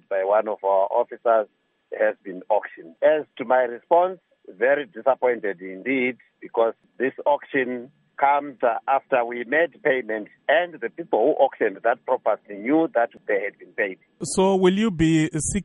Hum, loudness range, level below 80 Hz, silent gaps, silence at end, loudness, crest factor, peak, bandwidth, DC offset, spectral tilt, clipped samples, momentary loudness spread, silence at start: none; 2 LU; -54 dBFS; none; 0 s; -23 LUFS; 18 dB; -4 dBFS; 10.5 kHz; under 0.1%; -5 dB/octave; under 0.1%; 9 LU; 0.1 s